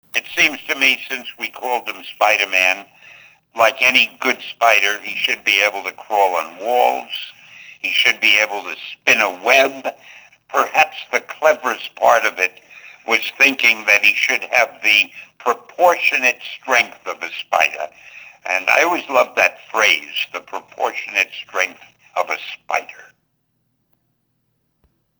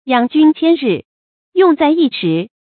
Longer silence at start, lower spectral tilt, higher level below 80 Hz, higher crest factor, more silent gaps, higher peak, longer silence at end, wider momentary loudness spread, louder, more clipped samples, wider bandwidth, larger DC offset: about the same, 0.15 s vs 0.05 s; second, -0.5 dB/octave vs -11.5 dB/octave; second, -70 dBFS vs -62 dBFS; about the same, 18 dB vs 14 dB; second, none vs 1.05-1.52 s; about the same, 0 dBFS vs 0 dBFS; first, 2.2 s vs 0.2 s; first, 13 LU vs 8 LU; second, -16 LUFS vs -13 LUFS; neither; first, over 20 kHz vs 4.5 kHz; neither